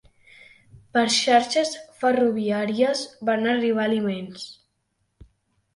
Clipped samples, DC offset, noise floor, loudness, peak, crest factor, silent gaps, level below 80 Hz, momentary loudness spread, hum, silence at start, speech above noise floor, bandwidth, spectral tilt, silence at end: under 0.1%; under 0.1%; -73 dBFS; -22 LUFS; -6 dBFS; 18 dB; none; -64 dBFS; 11 LU; none; 0.95 s; 51 dB; 11.5 kHz; -3.5 dB/octave; 1.2 s